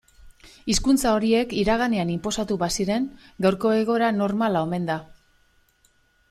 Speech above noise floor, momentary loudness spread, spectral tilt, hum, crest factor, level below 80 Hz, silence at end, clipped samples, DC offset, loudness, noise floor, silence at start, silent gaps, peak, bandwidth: 40 dB; 7 LU; -5 dB/octave; none; 16 dB; -44 dBFS; 1.15 s; under 0.1%; under 0.1%; -23 LUFS; -63 dBFS; 0.25 s; none; -8 dBFS; 14.5 kHz